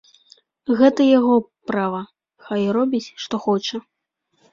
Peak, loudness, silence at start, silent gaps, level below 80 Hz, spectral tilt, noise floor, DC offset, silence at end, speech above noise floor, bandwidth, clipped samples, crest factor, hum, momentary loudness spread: -2 dBFS; -19 LUFS; 0.7 s; none; -64 dBFS; -6 dB/octave; -71 dBFS; under 0.1%; 0.75 s; 52 dB; 7.4 kHz; under 0.1%; 18 dB; none; 15 LU